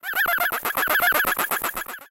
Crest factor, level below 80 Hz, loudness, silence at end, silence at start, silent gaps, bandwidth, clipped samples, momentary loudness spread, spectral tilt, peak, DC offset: 18 dB; -54 dBFS; -21 LUFS; 0.05 s; 0.05 s; none; 17 kHz; under 0.1%; 8 LU; -0.5 dB/octave; -4 dBFS; under 0.1%